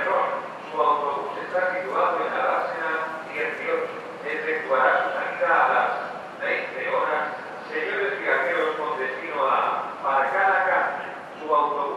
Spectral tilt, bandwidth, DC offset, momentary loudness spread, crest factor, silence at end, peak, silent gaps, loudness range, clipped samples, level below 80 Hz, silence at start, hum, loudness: -4.5 dB/octave; 11.5 kHz; under 0.1%; 10 LU; 18 dB; 0 s; -6 dBFS; none; 2 LU; under 0.1%; -76 dBFS; 0 s; none; -24 LUFS